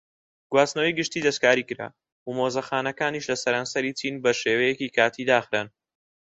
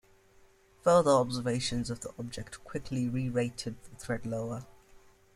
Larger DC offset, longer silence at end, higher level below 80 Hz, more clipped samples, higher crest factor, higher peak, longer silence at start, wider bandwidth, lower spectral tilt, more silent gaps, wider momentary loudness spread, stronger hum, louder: neither; about the same, 0.6 s vs 0.65 s; second, -68 dBFS vs -56 dBFS; neither; about the same, 22 dB vs 20 dB; first, -4 dBFS vs -12 dBFS; second, 0.5 s vs 0.85 s; second, 8.4 kHz vs 13 kHz; second, -3.5 dB/octave vs -5.5 dB/octave; first, 2.12-2.26 s vs none; second, 11 LU vs 16 LU; neither; first, -24 LUFS vs -31 LUFS